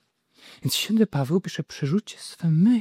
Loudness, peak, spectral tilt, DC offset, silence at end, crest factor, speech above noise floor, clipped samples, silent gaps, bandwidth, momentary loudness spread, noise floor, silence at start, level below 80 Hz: -24 LUFS; -8 dBFS; -6 dB/octave; under 0.1%; 0 s; 16 dB; 32 dB; under 0.1%; none; 16 kHz; 12 LU; -55 dBFS; 0.65 s; -64 dBFS